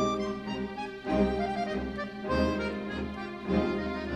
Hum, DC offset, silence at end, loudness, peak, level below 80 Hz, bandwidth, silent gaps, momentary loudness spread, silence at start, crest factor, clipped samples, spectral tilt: none; under 0.1%; 0 s; -32 LUFS; -14 dBFS; -44 dBFS; 10 kHz; none; 8 LU; 0 s; 16 dB; under 0.1%; -6.5 dB/octave